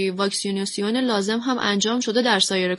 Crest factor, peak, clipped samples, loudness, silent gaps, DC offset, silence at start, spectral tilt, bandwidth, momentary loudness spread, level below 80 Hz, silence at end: 18 dB; -4 dBFS; under 0.1%; -21 LUFS; none; under 0.1%; 0 s; -3.5 dB/octave; 11.5 kHz; 6 LU; -64 dBFS; 0 s